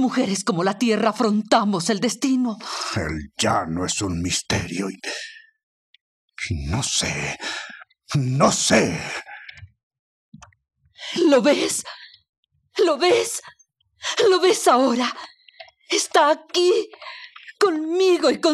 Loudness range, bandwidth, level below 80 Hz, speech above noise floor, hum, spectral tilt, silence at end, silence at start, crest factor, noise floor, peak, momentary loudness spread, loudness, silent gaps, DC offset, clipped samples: 6 LU; 13.5 kHz; -50 dBFS; 32 dB; none; -4 dB/octave; 0 s; 0 s; 20 dB; -52 dBFS; -2 dBFS; 15 LU; -21 LUFS; 5.63-5.94 s, 6.01-6.28 s, 9.83-9.91 s, 9.99-10.32 s, 12.29-12.43 s; under 0.1%; under 0.1%